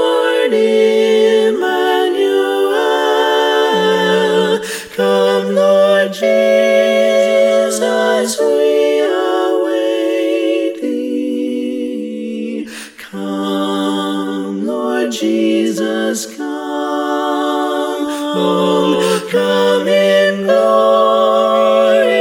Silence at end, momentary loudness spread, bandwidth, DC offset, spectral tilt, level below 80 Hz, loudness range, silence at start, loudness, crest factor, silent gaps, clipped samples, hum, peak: 0 s; 9 LU; 17 kHz; under 0.1%; -4 dB/octave; -66 dBFS; 7 LU; 0 s; -14 LUFS; 14 dB; none; under 0.1%; none; 0 dBFS